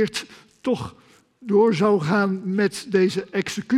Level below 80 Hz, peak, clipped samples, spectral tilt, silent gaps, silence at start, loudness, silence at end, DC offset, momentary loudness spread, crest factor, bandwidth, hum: -64 dBFS; -6 dBFS; under 0.1%; -6 dB/octave; none; 0 s; -22 LUFS; 0 s; under 0.1%; 13 LU; 16 dB; 13.5 kHz; none